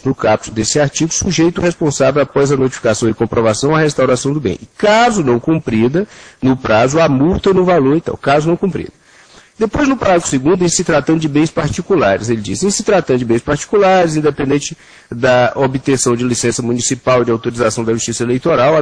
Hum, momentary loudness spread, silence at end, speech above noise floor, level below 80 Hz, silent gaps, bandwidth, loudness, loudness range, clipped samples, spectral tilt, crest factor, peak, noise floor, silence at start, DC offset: none; 6 LU; 0 s; 30 dB; -40 dBFS; none; 10.5 kHz; -13 LUFS; 1 LU; under 0.1%; -5 dB/octave; 14 dB; 0 dBFS; -44 dBFS; 0.05 s; under 0.1%